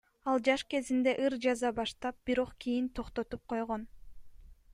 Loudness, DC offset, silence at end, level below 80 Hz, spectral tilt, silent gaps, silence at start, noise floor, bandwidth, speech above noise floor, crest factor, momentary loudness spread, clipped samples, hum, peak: -33 LUFS; under 0.1%; 0 s; -56 dBFS; -4 dB/octave; none; 0.25 s; -52 dBFS; 11.5 kHz; 19 dB; 18 dB; 9 LU; under 0.1%; none; -14 dBFS